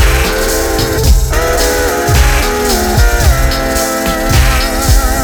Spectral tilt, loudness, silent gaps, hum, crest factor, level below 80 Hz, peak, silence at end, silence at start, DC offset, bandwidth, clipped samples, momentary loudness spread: -4 dB/octave; -11 LUFS; none; none; 10 dB; -12 dBFS; 0 dBFS; 0 s; 0 s; under 0.1%; over 20 kHz; under 0.1%; 3 LU